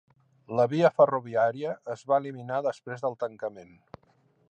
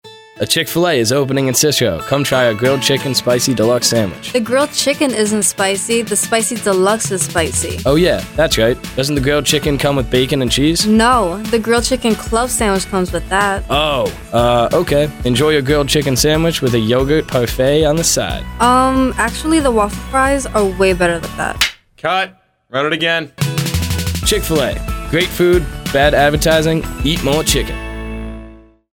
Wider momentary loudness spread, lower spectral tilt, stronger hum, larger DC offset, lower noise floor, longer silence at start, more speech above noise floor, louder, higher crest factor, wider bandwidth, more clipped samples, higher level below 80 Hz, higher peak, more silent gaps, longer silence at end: first, 12 LU vs 6 LU; first, -7 dB/octave vs -4 dB/octave; neither; neither; first, -66 dBFS vs -38 dBFS; first, 0.5 s vs 0.05 s; first, 39 dB vs 24 dB; second, -27 LUFS vs -14 LUFS; first, 20 dB vs 14 dB; second, 8.8 kHz vs over 20 kHz; neither; second, -74 dBFS vs -30 dBFS; second, -8 dBFS vs 0 dBFS; neither; first, 0.85 s vs 0.35 s